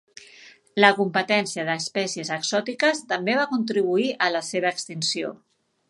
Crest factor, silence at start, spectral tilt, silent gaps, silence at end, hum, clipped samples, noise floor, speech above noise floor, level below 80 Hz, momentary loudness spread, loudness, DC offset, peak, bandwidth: 24 dB; 0.2 s; -3.5 dB/octave; none; 0.55 s; none; under 0.1%; -50 dBFS; 27 dB; -76 dBFS; 8 LU; -23 LUFS; under 0.1%; 0 dBFS; 11.5 kHz